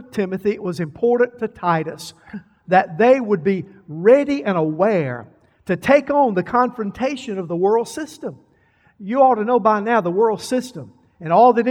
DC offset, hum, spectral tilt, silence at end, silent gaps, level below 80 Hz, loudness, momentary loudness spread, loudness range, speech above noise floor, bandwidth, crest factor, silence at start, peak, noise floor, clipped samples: under 0.1%; none; -6.5 dB/octave; 0 s; none; -60 dBFS; -18 LUFS; 19 LU; 2 LU; 40 dB; 15 kHz; 18 dB; 0 s; 0 dBFS; -57 dBFS; under 0.1%